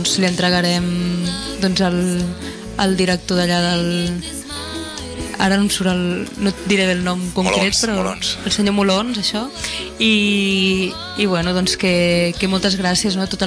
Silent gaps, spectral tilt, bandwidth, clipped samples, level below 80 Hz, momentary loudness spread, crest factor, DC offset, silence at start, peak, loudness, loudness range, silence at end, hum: none; -4 dB/octave; 11 kHz; under 0.1%; -40 dBFS; 9 LU; 16 dB; under 0.1%; 0 s; -2 dBFS; -18 LUFS; 3 LU; 0 s; none